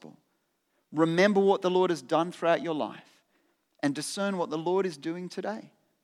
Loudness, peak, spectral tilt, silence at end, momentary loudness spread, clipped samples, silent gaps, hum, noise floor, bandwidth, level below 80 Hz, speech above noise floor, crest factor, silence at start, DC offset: -28 LUFS; -8 dBFS; -5.5 dB/octave; 0.35 s; 13 LU; under 0.1%; none; none; -75 dBFS; 13.5 kHz; -88 dBFS; 48 dB; 20 dB; 0.05 s; under 0.1%